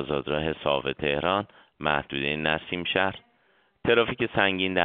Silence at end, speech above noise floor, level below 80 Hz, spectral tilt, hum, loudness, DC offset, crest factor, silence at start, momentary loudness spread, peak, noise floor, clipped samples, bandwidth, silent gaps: 0 s; 39 dB; -52 dBFS; -2.5 dB/octave; none; -26 LUFS; under 0.1%; 22 dB; 0 s; 6 LU; -4 dBFS; -66 dBFS; under 0.1%; 4.6 kHz; none